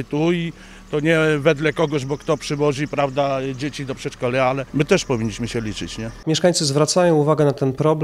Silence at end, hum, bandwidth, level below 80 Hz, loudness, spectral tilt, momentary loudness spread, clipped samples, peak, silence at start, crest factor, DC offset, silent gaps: 0 s; none; 13.5 kHz; -46 dBFS; -20 LUFS; -5 dB/octave; 11 LU; under 0.1%; -2 dBFS; 0 s; 18 dB; under 0.1%; none